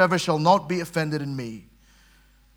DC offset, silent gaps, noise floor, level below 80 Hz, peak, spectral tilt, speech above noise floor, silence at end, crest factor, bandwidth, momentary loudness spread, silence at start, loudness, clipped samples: under 0.1%; none; -57 dBFS; -58 dBFS; -4 dBFS; -5.5 dB/octave; 34 dB; 0.95 s; 20 dB; 19 kHz; 16 LU; 0 s; -23 LUFS; under 0.1%